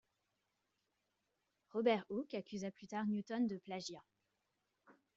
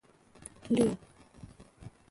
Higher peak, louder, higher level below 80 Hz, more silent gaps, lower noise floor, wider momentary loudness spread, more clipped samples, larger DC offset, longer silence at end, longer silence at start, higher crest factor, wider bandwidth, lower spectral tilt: second, -22 dBFS vs -16 dBFS; second, -41 LUFS vs -31 LUFS; second, -84 dBFS vs -60 dBFS; neither; first, -86 dBFS vs -54 dBFS; second, 11 LU vs 25 LU; neither; neither; about the same, 0.25 s vs 0.2 s; first, 1.75 s vs 0.65 s; about the same, 22 dB vs 20 dB; second, 7.6 kHz vs 11.5 kHz; about the same, -5 dB/octave vs -6 dB/octave